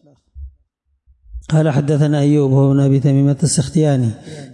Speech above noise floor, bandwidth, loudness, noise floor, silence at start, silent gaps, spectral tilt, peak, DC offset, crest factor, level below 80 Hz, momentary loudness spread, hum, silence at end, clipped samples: 50 dB; 11 kHz; -15 LUFS; -65 dBFS; 0.35 s; none; -7 dB/octave; -4 dBFS; under 0.1%; 10 dB; -42 dBFS; 6 LU; none; 0.05 s; under 0.1%